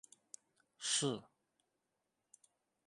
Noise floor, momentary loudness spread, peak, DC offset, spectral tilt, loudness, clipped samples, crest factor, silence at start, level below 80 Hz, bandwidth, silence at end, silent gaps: -87 dBFS; 22 LU; -22 dBFS; under 0.1%; -2.5 dB/octave; -38 LUFS; under 0.1%; 24 dB; 0.8 s; -90 dBFS; 11.5 kHz; 1.65 s; none